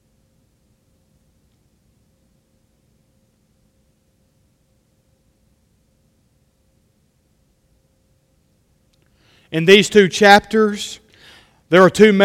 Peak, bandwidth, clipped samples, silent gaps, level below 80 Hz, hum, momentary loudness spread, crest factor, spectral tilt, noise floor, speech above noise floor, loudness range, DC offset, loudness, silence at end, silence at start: 0 dBFS; 16 kHz; under 0.1%; none; -56 dBFS; none; 17 LU; 20 dB; -4.5 dB/octave; -61 dBFS; 50 dB; 6 LU; under 0.1%; -13 LUFS; 0 s; 9.5 s